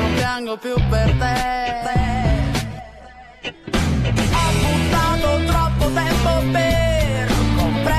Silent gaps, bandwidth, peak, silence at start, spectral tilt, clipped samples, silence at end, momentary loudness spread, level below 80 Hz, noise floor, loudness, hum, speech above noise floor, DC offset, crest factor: none; 14 kHz; -6 dBFS; 0 s; -5.5 dB/octave; under 0.1%; 0 s; 7 LU; -24 dBFS; -41 dBFS; -19 LUFS; none; 21 dB; under 0.1%; 12 dB